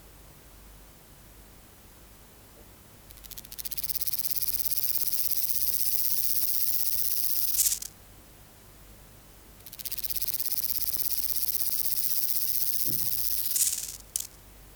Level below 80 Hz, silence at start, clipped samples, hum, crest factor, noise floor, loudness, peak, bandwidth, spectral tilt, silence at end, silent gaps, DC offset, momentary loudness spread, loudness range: -56 dBFS; 0 s; under 0.1%; none; 24 dB; -52 dBFS; -25 LUFS; -6 dBFS; over 20 kHz; 0.5 dB/octave; 0 s; none; under 0.1%; 11 LU; 8 LU